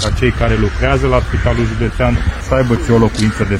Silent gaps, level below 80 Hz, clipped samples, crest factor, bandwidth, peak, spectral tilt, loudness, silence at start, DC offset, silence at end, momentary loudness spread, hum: none; -20 dBFS; under 0.1%; 12 dB; 12 kHz; 0 dBFS; -6.5 dB/octave; -14 LUFS; 0 s; under 0.1%; 0 s; 4 LU; none